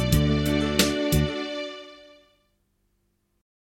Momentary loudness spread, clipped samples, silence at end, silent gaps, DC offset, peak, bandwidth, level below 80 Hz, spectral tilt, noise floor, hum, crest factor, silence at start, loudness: 13 LU; under 0.1%; 1.8 s; none; under 0.1%; -4 dBFS; 16.5 kHz; -36 dBFS; -5 dB/octave; -71 dBFS; 50 Hz at -50 dBFS; 22 dB; 0 s; -24 LUFS